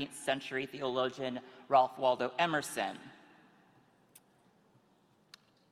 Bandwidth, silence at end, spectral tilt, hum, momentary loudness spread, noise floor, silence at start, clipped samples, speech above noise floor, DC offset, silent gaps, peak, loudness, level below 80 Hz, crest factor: 15.5 kHz; 2.55 s; -3.5 dB/octave; none; 11 LU; -69 dBFS; 0 s; under 0.1%; 35 dB; under 0.1%; none; -14 dBFS; -33 LUFS; -78 dBFS; 22 dB